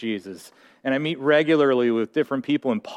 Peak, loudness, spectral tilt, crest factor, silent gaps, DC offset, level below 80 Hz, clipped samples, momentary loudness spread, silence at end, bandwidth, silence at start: -6 dBFS; -22 LUFS; -6.5 dB/octave; 16 dB; none; under 0.1%; -74 dBFS; under 0.1%; 14 LU; 0 s; 13 kHz; 0 s